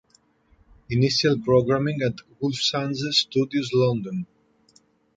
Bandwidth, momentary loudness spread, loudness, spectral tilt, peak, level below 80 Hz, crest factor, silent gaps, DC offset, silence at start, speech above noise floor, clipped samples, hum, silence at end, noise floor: 9.2 kHz; 9 LU; -23 LUFS; -5.5 dB/octave; -6 dBFS; -56 dBFS; 18 dB; none; under 0.1%; 0.9 s; 39 dB; under 0.1%; none; 0.95 s; -61 dBFS